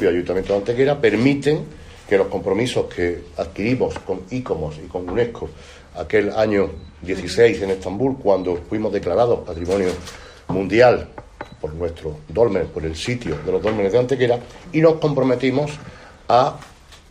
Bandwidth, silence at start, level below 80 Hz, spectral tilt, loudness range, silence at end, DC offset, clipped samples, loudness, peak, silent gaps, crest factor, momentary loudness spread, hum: 11 kHz; 0 s; -42 dBFS; -6.5 dB/octave; 4 LU; 0.15 s; under 0.1%; under 0.1%; -20 LUFS; -2 dBFS; none; 18 dB; 15 LU; none